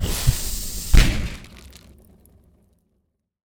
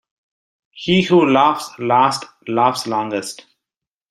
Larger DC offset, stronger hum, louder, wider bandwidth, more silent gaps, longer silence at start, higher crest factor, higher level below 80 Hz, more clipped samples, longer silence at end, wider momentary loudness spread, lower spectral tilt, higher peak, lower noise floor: neither; neither; second, -22 LUFS vs -17 LUFS; first, over 20 kHz vs 14 kHz; neither; second, 0 s vs 0.75 s; about the same, 20 dB vs 16 dB; first, -24 dBFS vs -56 dBFS; neither; first, 1.8 s vs 0.75 s; first, 23 LU vs 13 LU; about the same, -4 dB/octave vs -5 dB/octave; about the same, -2 dBFS vs -2 dBFS; second, -71 dBFS vs -86 dBFS